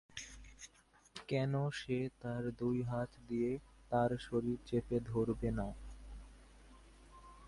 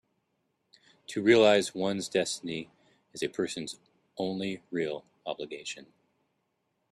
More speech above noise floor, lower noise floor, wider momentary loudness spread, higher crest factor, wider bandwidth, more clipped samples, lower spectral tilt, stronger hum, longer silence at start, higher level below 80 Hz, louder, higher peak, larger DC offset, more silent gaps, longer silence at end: second, 30 dB vs 49 dB; second, -67 dBFS vs -78 dBFS; second, 19 LU vs 22 LU; about the same, 20 dB vs 22 dB; second, 11.5 kHz vs 13 kHz; neither; first, -7 dB/octave vs -4 dB/octave; neither; second, 0.15 s vs 1.1 s; first, -56 dBFS vs -72 dBFS; second, -39 LUFS vs -30 LUFS; second, -20 dBFS vs -8 dBFS; neither; neither; second, 0 s vs 1.1 s